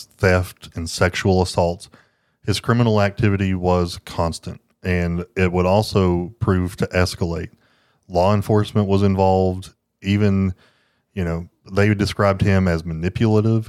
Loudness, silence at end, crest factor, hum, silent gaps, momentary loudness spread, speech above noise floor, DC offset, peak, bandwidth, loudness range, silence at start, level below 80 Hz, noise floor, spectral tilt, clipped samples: -20 LUFS; 0.05 s; 18 dB; none; none; 13 LU; 41 dB; under 0.1%; -2 dBFS; 13.5 kHz; 1 LU; 0 s; -40 dBFS; -59 dBFS; -6.5 dB/octave; under 0.1%